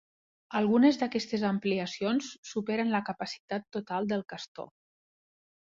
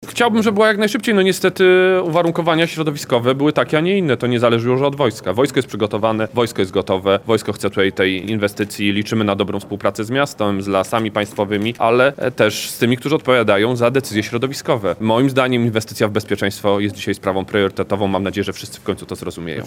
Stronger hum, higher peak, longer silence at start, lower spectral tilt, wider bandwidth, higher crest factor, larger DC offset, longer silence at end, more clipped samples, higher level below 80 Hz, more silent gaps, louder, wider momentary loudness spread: neither; second, -12 dBFS vs 0 dBFS; first, 0.5 s vs 0 s; about the same, -5.5 dB/octave vs -5.5 dB/octave; second, 7.6 kHz vs 17.5 kHz; about the same, 20 dB vs 16 dB; neither; first, 0.95 s vs 0 s; neither; second, -72 dBFS vs -54 dBFS; first, 2.38-2.43 s, 3.40-3.48 s, 4.48-4.55 s vs none; second, -30 LUFS vs -17 LUFS; first, 16 LU vs 7 LU